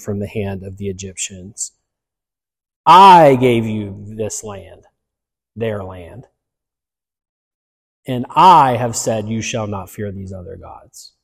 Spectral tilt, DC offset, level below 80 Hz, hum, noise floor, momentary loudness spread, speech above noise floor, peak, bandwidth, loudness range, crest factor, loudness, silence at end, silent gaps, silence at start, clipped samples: -4.5 dB/octave; under 0.1%; -50 dBFS; none; -89 dBFS; 23 LU; 74 dB; 0 dBFS; 15.5 kHz; 17 LU; 16 dB; -13 LUFS; 0.2 s; 2.76-2.84 s, 7.29-8.03 s; 0.05 s; under 0.1%